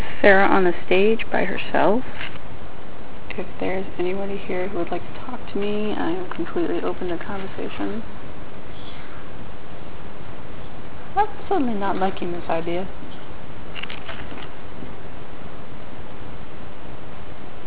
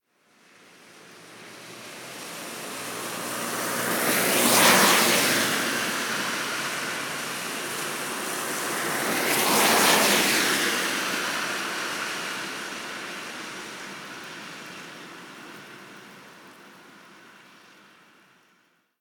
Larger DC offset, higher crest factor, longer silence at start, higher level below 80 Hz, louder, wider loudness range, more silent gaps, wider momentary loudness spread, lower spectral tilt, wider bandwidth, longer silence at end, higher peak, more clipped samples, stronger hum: first, 10% vs under 0.1%; about the same, 24 dB vs 22 dB; second, 0 s vs 0.85 s; first, -46 dBFS vs -68 dBFS; about the same, -24 LUFS vs -23 LUFS; second, 13 LU vs 18 LU; neither; second, 19 LU vs 23 LU; first, -9 dB/octave vs -1.5 dB/octave; second, 4 kHz vs 19.5 kHz; second, 0 s vs 1.65 s; first, 0 dBFS vs -6 dBFS; neither; neither